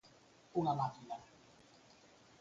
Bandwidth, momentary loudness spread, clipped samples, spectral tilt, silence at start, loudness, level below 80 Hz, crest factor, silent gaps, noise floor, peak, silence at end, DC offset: 7.8 kHz; 26 LU; under 0.1%; -7.5 dB/octave; 0.55 s; -40 LUFS; -76 dBFS; 20 dB; none; -65 dBFS; -22 dBFS; 1.15 s; under 0.1%